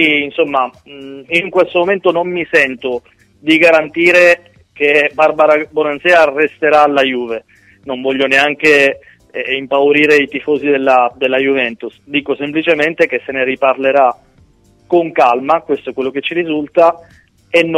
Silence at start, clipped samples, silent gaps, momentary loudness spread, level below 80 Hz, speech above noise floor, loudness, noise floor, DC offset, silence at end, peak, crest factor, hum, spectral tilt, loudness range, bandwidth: 0 s; 0.1%; none; 11 LU; -56 dBFS; 36 dB; -12 LUFS; -49 dBFS; under 0.1%; 0 s; 0 dBFS; 14 dB; none; -4.5 dB/octave; 4 LU; 14 kHz